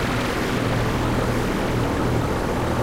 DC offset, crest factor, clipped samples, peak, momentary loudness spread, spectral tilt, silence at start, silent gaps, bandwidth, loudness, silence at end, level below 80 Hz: 0.7%; 12 dB; under 0.1%; -10 dBFS; 1 LU; -6 dB/octave; 0 s; none; 16 kHz; -23 LUFS; 0 s; -32 dBFS